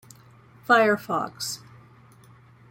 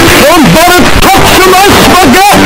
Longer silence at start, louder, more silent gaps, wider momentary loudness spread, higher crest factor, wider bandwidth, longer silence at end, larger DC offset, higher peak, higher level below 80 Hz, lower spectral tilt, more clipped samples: first, 0.7 s vs 0 s; second, -23 LUFS vs -2 LUFS; neither; first, 17 LU vs 1 LU; first, 22 dB vs 2 dB; second, 16.5 kHz vs over 20 kHz; first, 1.15 s vs 0 s; neither; second, -6 dBFS vs 0 dBFS; second, -68 dBFS vs -18 dBFS; about the same, -3.5 dB/octave vs -3.5 dB/octave; second, under 0.1% vs 10%